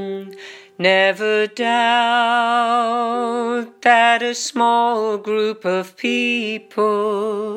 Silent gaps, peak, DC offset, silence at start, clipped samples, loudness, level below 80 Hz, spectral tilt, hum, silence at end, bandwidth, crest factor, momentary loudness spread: none; -2 dBFS; under 0.1%; 0 s; under 0.1%; -17 LUFS; -78 dBFS; -3 dB/octave; none; 0 s; 14 kHz; 16 dB; 8 LU